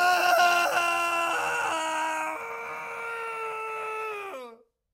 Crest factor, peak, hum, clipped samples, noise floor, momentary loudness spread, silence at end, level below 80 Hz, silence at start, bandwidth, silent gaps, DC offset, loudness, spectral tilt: 16 dB; -10 dBFS; none; under 0.1%; -49 dBFS; 14 LU; 0.4 s; -72 dBFS; 0 s; 16 kHz; none; under 0.1%; -27 LUFS; -0.5 dB/octave